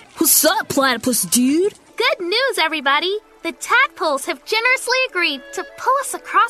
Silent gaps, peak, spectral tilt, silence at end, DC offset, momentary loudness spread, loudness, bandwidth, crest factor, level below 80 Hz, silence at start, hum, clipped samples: none; 0 dBFS; -1 dB/octave; 0 s; under 0.1%; 10 LU; -17 LUFS; 14 kHz; 18 dB; -60 dBFS; 0.15 s; none; under 0.1%